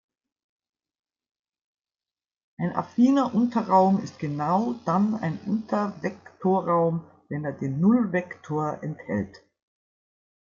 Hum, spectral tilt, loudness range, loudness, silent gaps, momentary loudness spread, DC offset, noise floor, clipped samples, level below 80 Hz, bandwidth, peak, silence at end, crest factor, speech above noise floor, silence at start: none; -8.5 dB/octave; 4 LU; -25 LUFS; none; 12 LU; under 0.1%; under -90 dBFS; under 0.1%; -70 dBFS; 7.4 kHz; -8 dBFS; 1.05 s; 18 dB; over 66 dB; 2.6 s